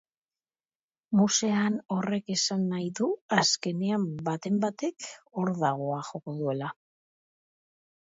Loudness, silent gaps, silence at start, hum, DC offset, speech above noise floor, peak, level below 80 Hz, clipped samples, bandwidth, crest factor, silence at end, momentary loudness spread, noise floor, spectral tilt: -28 LUFS; 3.21-3.29 s; 1.1 s; none; under 0.1%; over 62 dB; -8 dBFS; -74 dBFS; under 0.1%; 8 kHz; 22 dB; 1.35 s; 11 LU; under -90 dBFS; -4 dB/octave